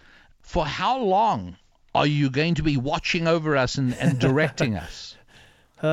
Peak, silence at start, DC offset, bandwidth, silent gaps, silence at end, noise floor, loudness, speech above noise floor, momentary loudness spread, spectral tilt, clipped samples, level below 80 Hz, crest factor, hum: -6 dBFS; 0.45 s; under 0.1%; 12 kHz; none; 0 s; -53 dBFS; -23 LUFS; 31 dB; 10 LU; -6 dB/octave; under 0.1%; -44 dBFS; 18 dB; none